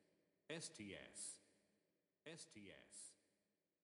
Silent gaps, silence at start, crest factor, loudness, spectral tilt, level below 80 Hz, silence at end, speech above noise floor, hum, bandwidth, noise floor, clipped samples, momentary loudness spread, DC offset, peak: none; 0 s; 22 dB; -56 LUFS; -2.5 dB/octave; under -90 dBFS; 0.7 s; 32 dB; none; 11 kHz; -90 dBFS; under 0.1%; 9 LU; under 0.1%; -38 dBFS